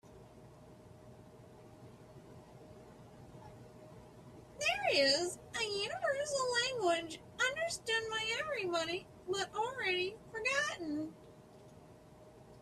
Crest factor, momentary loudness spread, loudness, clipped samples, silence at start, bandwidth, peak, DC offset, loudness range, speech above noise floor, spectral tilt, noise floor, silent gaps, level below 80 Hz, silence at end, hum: 20 dB; 24 LU; -35 LUFS; under 0.1%; 0.05 s; 14 kHz; -18 dBFS; under 0.1%; 22 LU; 22 dB; -2 dB/octave; -58 dBFS; none; -70 dBFS; 0 s; none